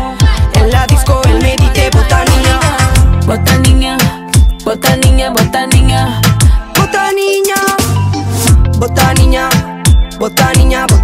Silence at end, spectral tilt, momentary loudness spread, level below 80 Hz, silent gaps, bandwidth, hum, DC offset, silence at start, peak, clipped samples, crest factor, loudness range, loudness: 0 s; -4.5 dB/octave; 3 LU; -12 dBFS; none; 16.5 kHz; none; under 0.1%; 0 s; 0 dBFS; under 0.1%; 8 dB; 1 LU; -10 LUFS